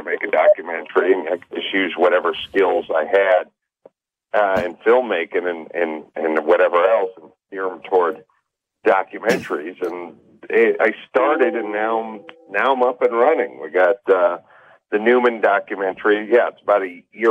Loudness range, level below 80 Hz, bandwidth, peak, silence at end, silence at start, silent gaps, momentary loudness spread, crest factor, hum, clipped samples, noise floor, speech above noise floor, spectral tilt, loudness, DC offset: 3 LU; -64 dBFS; 9 kHz; -4 dBFS; 0 s; 0 s; none; 11 LU; 14 dB; none; under 0.1%; -71 dBFS; 52 dB; -5 dB/octave; -19 LUFS; under 0.1%